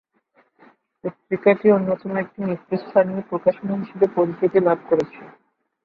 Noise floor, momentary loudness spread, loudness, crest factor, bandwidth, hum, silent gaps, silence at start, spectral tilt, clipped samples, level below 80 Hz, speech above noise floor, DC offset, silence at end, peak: -62 dBFS; 10 LU; -21 LUFS; 20 dB; 6.2 kHz; none; none; 1.05 s; -9.5 dB/octave; under 0.1%; -64 dBFS; 41 dB; under 0.1%; 0.55 s; -2 dBFS